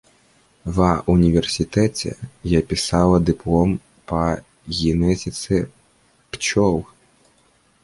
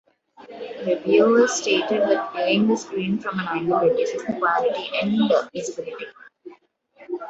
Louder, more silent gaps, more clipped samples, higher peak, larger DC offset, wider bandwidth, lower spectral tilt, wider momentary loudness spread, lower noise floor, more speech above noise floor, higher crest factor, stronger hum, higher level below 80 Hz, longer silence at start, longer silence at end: about the same, -20 LUFS vs -21 LUFS; neither; neither; about the same, -2 dBFS vs -4 dBFS; neither; first, 11.5 kHz vs 8.2 kHz; first, -6 dB/octave vs -4.5 dB/octave; second, 12 LU vs 15 LU; first, -59 dBFS vs -54 dBFS; first, 40 dB vs 33 dB; about the same, 18 dB vs 18 dB; neither; first, -36 dBFS vs -66 dBFS; first, 0.65 s vs 0.4 s; first, 1 s vs 0 s